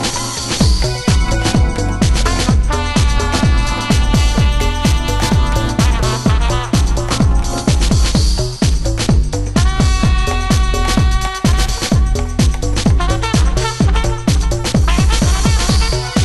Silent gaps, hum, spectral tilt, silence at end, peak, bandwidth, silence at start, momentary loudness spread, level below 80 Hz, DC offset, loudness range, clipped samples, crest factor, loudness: none; none; -5 dB/octave; 0 s; 0 dBFS; 12.5 kHz; 0 s; 3 LU; -16 dBFS; under 0.1%; 1 LU; under 0.1%; 12 dB; -15 LUFS